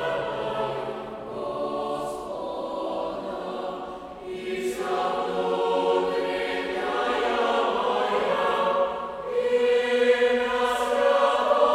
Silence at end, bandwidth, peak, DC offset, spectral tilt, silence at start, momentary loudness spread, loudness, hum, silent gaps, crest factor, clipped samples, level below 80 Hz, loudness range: 0 s; 14 kHz; -8 dBFS; under 0.1%; -4 dB/octave; 0 s; 11 LU; -25 LUFS; none; none; 18 dB; under 0.1%; -58 dBFS; 8 LU